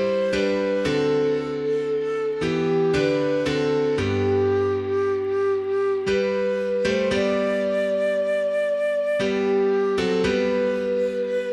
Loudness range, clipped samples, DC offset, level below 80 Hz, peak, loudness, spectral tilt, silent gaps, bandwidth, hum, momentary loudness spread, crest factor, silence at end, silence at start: 1 LU; under 0.1%; under 0.1%; -52 dBFS; -10 dBFS; -22 LUFS; -6 dB/octave; none; 10.5 kHz; none; 3 LU; 12 dB; 0 s; 0 s